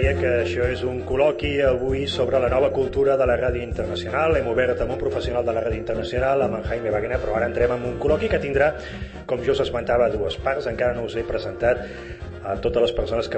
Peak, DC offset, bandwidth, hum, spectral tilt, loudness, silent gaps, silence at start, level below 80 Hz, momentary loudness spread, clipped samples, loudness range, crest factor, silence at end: -6 dBFS; under 0.1%; 8.4 kHz; none; -6.5 dB/octave; -22 LUFS; none; 0 s; -36 dBFS; 7 LU; under 0.1%; 2 LU; 16 dB; 0 s